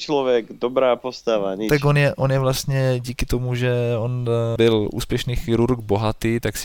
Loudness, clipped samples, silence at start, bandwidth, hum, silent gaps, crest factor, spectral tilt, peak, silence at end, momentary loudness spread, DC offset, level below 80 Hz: -21 LUFS; under 0.1%; 0 s; 18 kHz; none; none; 14 dB; -6 dB/octave; -6 dBFS; 0 s; 6 LU; under 0.1%; -36 dBFS